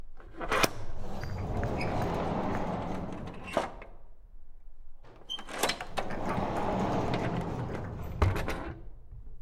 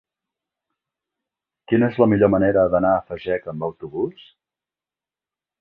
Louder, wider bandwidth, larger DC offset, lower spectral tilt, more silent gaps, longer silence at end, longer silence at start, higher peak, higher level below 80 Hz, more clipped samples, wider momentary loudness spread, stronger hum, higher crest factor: second, -34 LUFS vs -20 LUFS; first, 16.5 kHz vs 4.7 kHz; neither; second, -5 dB/octave vs -11 dB/octave; neither; second, 0.05 s vs 1.5 s; second, 0 s vs 1.7 s; second, -6 dBFS vs -2 dBFS; first, -42 dBFS vs -50 dBFS; neither; about the same, 13 LU vs 12 LU; neither; first, 26 dB vs 20 dB